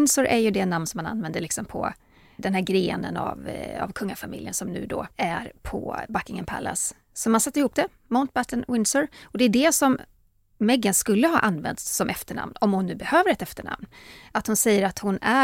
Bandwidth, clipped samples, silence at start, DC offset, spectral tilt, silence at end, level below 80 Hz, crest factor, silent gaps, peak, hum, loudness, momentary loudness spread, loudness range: 16.5 kHz; under 0.1%; 0 s; under 0.1%; -4 dB/octave; 0 s; -52 dBFS; 20 dB; none; -6 dBFS; none; -24 LUFS; 12 LU; 7 LU